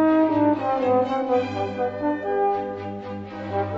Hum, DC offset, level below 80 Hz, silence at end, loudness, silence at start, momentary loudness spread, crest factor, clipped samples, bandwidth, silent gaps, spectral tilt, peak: none; under 0.1%; -58 dBFS; 0 s; -23 LUFS; 0 s; 13 LU; 14 dB; under 0.1%; 7.2 kHz; none; -8 dB/octave; -8 dBFS